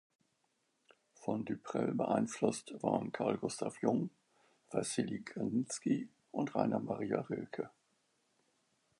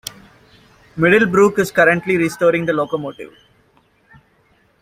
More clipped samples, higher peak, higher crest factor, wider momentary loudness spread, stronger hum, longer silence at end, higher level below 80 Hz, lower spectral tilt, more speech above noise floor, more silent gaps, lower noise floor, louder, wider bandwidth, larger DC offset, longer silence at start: neither; second, -16 dBFS vs -2 dBFS; about the same, 22 dB vs 18 dB; second, 7 LU vs 21 LU; neither; second, 1.3 s vs 1.55 s; second, -76 dBFS vs -54 dBFS; about the same, -5.5 dB/octave vs -5.5 dB/octave; about the same, 44 dB vs 42 dB; neither; first, -80 dBFS vs -57 dBFS; second, -38 LUFS vs -15 LUFS; second, 11.5 kHz vs 16 kHz; neither; first, 1.2 s vs 0.95 s